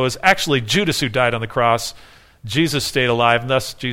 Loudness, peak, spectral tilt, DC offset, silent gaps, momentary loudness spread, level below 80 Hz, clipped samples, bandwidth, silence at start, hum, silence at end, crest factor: -17 LUFS; 0 dBFS; -4 dB/octave; under 0.1%; none; 6 LU; -44 dBFS; under 0.1%; 17 kHz; 0 s; none; 0 s; 18 dB